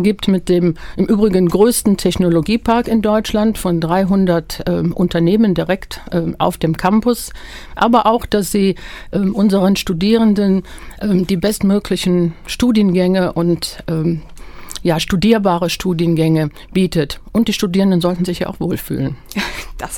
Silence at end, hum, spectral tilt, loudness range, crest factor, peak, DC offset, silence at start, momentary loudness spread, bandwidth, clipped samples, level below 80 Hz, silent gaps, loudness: 0 s; none; -6 dB/octave; 2 LU; 14 dB; 0 dBFS; under 0.1%; 0 s; 9 LU; 17.5 kHz; under 0.1%; -36 dBFS; none; -16 LUFS